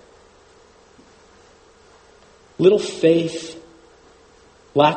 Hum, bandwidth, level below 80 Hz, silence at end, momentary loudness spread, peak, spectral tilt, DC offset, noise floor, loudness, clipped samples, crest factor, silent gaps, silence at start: none; 8.8 kHz; -60 dBFS; 0 s; 23 LU; 0 dBFS; -5.5 dB/octave; under 0.1%; -51 dBFS; -18 LUFS; under 0.1%; 22 dB; none; 2.6 s